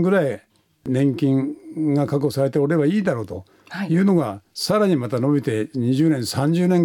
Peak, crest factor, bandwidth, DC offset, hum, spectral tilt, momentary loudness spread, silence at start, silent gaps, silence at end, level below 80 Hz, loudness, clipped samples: -8 dBFS; 12 dB; 17.5 kHz; under 0.1%; none; -7 dB/octave; 10 LU; 0 s; none; 0 s; -60 dBFS; -21 LUFS; under 0.1%